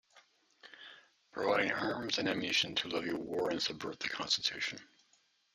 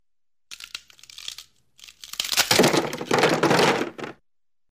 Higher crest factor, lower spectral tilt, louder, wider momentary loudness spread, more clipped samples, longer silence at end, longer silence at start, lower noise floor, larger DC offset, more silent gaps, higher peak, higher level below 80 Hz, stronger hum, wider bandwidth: about the same, 22 dB vs 20 dB; about the same, -2.5 dB/octave vs -3 dB/octave; second, -34 LUFS vs -21 LUFS; about the same, 19 LU vs 21 LU; neither; about the same, 0.7 s vs 0.6 s; second, 0.15 s vs 0.5 s; second, -72 dBFS vs under -90 dBFS; neither; neither; second, -16 dBFS vs -4 dBFS; second, -74 dBFS vs -62 dBFS; neither; about the same, 15 kHz vs 15.5 kHz